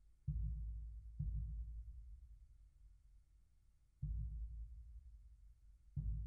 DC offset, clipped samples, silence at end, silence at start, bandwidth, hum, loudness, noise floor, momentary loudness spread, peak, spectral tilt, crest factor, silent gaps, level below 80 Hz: under 0.1%; under 0.1%; 0 s; 0 s; 0.5 kHz; none; -50 LUFS; -71 dBFS; 22 LU; -32 dBFS; -13 dB/octave; 16 dB; none; -50 dBFS